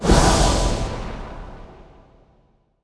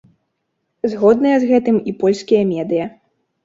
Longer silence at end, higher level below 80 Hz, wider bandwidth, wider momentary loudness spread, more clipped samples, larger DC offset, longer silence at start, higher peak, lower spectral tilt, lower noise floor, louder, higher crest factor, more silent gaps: first, 1.1 s vs 0.55 s; first, -26 dBFS vs -58 dBFS; first, 11 kHz vs 7.8 kHz; first, 24 LU vs 9 LU; neither; neither; second, 0 s vs 0.85 s; about the same, -2 dBFS vs -2 dBFS; second, -4.5 dB/octave vs -7 dB/octave; second, -60 dBFS vs -72 dBFS; second, -19 LUFS vs -16 LUFS; about the same, 18 dB vs 16 dB; neither